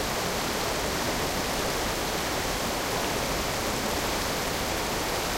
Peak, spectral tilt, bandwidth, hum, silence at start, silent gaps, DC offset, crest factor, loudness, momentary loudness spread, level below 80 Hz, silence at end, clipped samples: -14 dBFS; -3 dB/octave; 16 kHz; none; 0 s; none; under 0.1%; 14 dB; -28 LUFS; 1 LU; -42 dBFS; 0 s; under 0.1%